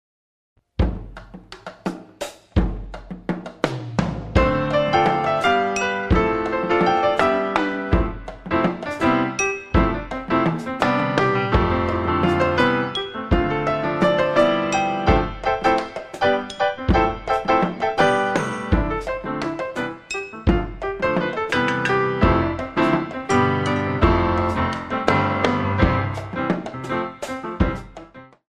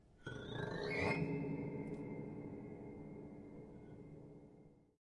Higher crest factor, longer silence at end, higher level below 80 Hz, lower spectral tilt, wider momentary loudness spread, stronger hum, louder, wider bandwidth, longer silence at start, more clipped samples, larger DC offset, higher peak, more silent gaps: about the same, 20 dB vs 20 dB; about the same, 0.3 s vs 0.25 s; first, -32 dBFS vs -68 dBFS; about the same, -6 dB/octave vs -7 dB/octave; second, 11 LU vs 18 LU; neither; first, -21 LUFS vs -45 LUFS; about the same, 12 kHz vs 11 kHz; first, 0.8 s vs 0 s; neither; neither; first, -2 dBFS vs -26 dBFS; neither